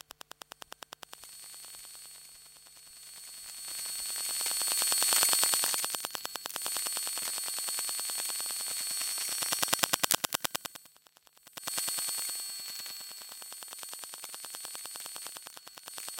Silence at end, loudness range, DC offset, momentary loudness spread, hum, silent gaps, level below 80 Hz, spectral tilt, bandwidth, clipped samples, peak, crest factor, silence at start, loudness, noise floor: 0 s; 13 LU; under 0.1%; 21 LU; none; none; -76 dBFS; 1.5 dB/octave; 17 kHz; under 0.1%; 0 dBFS; 36 dB; 1.1 s; -31 LUFS; -62 dBFS